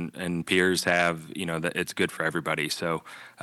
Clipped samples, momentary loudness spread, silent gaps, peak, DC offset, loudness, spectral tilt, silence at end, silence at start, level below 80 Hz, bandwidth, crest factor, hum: under 0.1%; 9 LU; none; -6 dBFS; under 0.1%; -27 LUFS; -4 dB/octave; 0 s; 0 s; -62 dBFS; 13 kHz; 20 dB; none